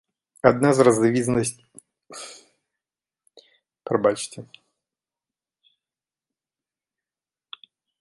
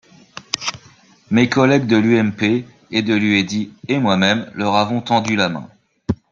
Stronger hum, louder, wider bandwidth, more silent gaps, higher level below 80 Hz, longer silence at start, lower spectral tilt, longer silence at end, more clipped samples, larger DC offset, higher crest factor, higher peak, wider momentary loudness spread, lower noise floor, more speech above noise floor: neither; second, -21 LUFS vs -17 LUFS; first, 11.5 kHz vs 7.4 kHz; neither; second, -60 dBFS vs -52 dBFS; about the same, 0.45 s vs 0.35 s; about the same, -5.5 dB/octave vs -5 dB/octave; first, 3.55 s vs 0.2 s; neither; neither; first, 24 dB vs 18 dB; about the same, -2 dBFS vs 0 dBFS; first, 26 LU vs 12 LU; first, under -90 dBFS vs -49 dBFS; first, over 70 dB vs 32 dB